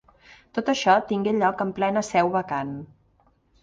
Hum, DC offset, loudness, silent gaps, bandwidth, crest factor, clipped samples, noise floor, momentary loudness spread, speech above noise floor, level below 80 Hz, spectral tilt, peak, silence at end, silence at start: none; under 0.1%; -24 LUFS; none; 9.8 kHz; 20 dB; under 0.1%; -63 dBFS; 11 LU; 40 dB; -60 dBFS; -5 dB/octave; -4 dBFS; 0.75 s; 0.55 s